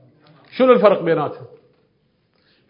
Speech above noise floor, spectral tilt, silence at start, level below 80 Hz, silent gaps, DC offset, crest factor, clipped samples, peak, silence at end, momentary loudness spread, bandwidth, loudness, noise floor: 48 dB; -9.5 dB/octave; 0.55 s; -70 dBFS; none; under 0.1%; 20 dB; under 0.1%; 0 dBFS; 1.25 s; 21 LU; 5.4 kHz; -16 LUFS; -63 dBFS